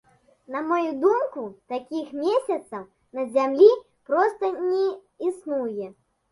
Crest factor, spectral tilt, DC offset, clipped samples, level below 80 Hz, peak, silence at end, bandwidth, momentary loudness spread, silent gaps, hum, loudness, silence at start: 20 dB; -5.5 dB/octave; under 0.1%; under 0.1%; -72 dBFS; -4 dBFS; 0.4 s; 11.5 kHz; 18 LU; none; none; -24 LUFS; 0.5 s